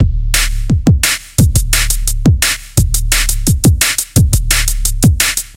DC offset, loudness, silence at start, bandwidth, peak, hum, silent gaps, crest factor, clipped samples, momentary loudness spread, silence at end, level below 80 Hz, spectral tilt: under 0.1%; -12 LUFS; 0 s; 17.5 kHz; 0 dBFS; none; none; 12 dB; under 0.1%; 3 LU; 0.05 s; -16 dBFS; -3.5 dB/octave